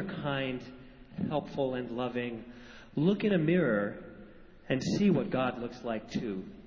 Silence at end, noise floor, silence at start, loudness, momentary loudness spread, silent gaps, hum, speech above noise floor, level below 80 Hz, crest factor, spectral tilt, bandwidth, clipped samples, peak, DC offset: 0 s; -52 dBFS; 0 s; -32 LUFS; 19 LU; none; none; 21 dB; -60 dBFS; 18 dB; -7 dB/octave; 7.6 kHz; under 0.1%; -14 dBFS; under 0.1%